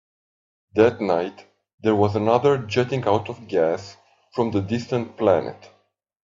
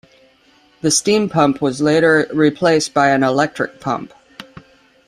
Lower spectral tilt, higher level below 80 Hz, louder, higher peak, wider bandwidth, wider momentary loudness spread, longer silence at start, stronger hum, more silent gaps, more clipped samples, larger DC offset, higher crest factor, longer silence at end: first, -7 dB/octave vs -4 dB/octave; second, -62 dBFS vs -56 dBFS; second, -22 LUFS vs -16 LUFS; about the same, -2 dBFS vs -2 dBFS; second, 7.6 kHz vs 13.5 kHz; about the same, 10 LU vs 10 LU; about the same, 0.75 s vs 0.85 s; neither; first, 1.74-1.78 s vs none; neither; neither; about the same, 20 dB vs 16 dB; about the same, 0.6 s vs 0.65 s